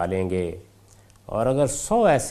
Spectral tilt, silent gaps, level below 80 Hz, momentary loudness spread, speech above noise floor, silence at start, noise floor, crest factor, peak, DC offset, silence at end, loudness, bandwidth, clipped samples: -5.5 dB/octave; none; -44 dBFS; 13 LU; 30 dB; 0 s; -53 dBFS; 18 dB; -6 dBFS; under 0.1%; 0 s; -23 LUFS; 15 kHz; under 0.1%